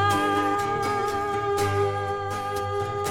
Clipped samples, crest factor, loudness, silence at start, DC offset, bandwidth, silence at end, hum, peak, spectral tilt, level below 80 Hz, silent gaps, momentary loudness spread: under 0.1%; 16 dB; -25 LUFS; 0 s; under 0.1%; 17 kHz; 0 s; none; -10 dBFS; -5 dB/octave; -52 dBFS; none; 6 LU